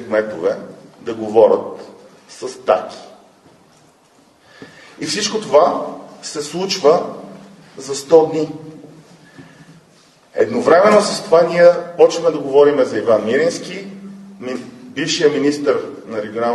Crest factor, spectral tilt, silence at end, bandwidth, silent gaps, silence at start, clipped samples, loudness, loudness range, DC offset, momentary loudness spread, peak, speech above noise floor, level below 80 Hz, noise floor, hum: 18 dB; -4 dB/octave; 0 s; 12.5 kHz; none; 0 s; under 0.1%; -15 LUFS; 8 LU; under 0.1%; 19 LU; 0 dBFS; 36 dB; -62 dBFS; -52 dBFS; none